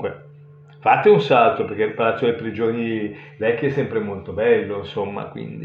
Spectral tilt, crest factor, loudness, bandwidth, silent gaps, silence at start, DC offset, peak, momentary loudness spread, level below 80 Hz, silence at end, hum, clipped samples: -8 dB/octave; 18 dB; -20 LUFS; 6.8 kHz; none; 0 s; under 0.1%; -2 dBFS; 14 LU; -62 dBFS; 0 s; none; under 0.1%